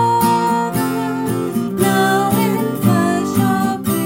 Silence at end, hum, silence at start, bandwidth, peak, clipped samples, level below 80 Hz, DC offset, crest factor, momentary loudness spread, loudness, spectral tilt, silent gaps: 0 s; none; 0 s; 17 kHz; -2 dBFS; under 0.1%; -54 dBFS; under 0.1%; 14 dB; 5 LU; -16 LUFS; -5.5 dB/octave; none